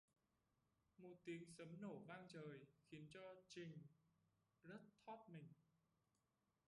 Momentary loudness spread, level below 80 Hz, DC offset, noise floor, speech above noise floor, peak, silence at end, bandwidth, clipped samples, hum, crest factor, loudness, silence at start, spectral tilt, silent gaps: 8 LU; under -90 dBFS; under 0.1%; -90 dBFS; 31 dB; -44 dBFS; 1.05 s; 11 kHz; under 0.1%; none; 18 dB; -60 LUFS; 1 s; -6 dB/octave; none